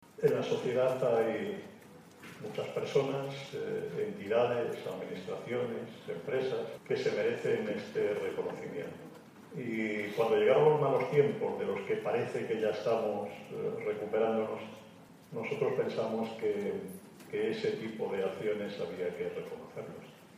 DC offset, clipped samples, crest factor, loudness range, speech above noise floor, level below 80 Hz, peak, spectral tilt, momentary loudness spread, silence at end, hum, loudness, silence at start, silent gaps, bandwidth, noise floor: under 0.1%; under 0.1%; 20 dB; 6 LU; 22 dB; -78 dBFS; -14 dBFS; -6.5 dB/octave; 15 LU; 0 s; none; -33 LUFS; 0.15 s; none; 15 kHz; -55 dBFS